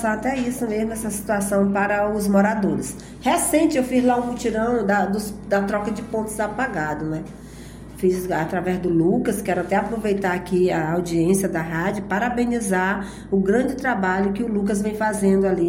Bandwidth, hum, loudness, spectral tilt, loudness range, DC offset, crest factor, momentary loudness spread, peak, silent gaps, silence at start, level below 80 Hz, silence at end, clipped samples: 16.5 kHz; none; -22 LUFS; -5.5 dB/octave; 4 LU; under 0.1%; 14 dB; 7 LU; -6 dBFS; none; 0 s; -44 dBFS; 0 s; under 0.1%